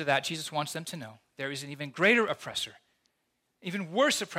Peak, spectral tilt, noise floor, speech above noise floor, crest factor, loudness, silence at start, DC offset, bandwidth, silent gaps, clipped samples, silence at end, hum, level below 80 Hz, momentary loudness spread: -10 dBFS; -3.5 dB/octave; -78 dBFS; 48 dB; 22 dB; -30 LUFS; 0 s; under 0.1%; 16.5 kHz; none; under 0.1%; 0 s; none; -76 dBFS; 16 LU